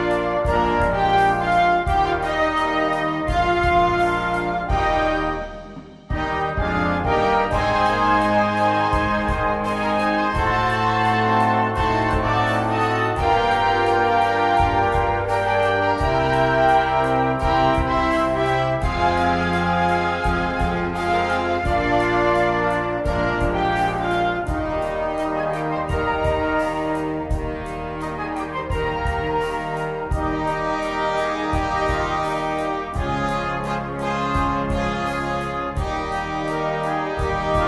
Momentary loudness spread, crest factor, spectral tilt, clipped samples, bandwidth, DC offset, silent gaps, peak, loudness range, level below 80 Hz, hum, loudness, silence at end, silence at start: 7 LU; 16 dB; -6 dB/octave; under 0.1%; 11.5 kHz; under 0.1%; none; -6 dBFS; 5 LU; -32 dBFS; none; -21 LUFS; 0 s; 0 s